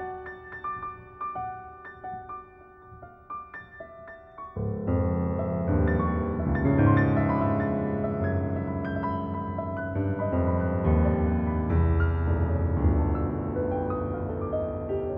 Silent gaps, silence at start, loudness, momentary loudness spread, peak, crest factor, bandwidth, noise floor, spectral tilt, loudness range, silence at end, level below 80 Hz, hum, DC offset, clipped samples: none; 0 s; -27 LUFS; 17 LU; -8 dBFS; 18 dB; 3.8 kHz; -50 dBFS; -12.5 dB/octave; 13 LU; 0 s; -36 dBFS; none; under 0.1%; under 0.1%